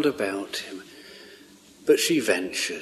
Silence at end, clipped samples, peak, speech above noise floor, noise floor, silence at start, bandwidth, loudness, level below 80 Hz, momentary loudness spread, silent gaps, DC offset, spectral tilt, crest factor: 0 s; under 0.1%; -6 dBFS; 26 dB; -51 dBFS; 0 s; 13.5 kHz; -25 LUFS; -70 dBFS; 24 LU; none; under 0.1%; -2.5 dB/octave; 20 dB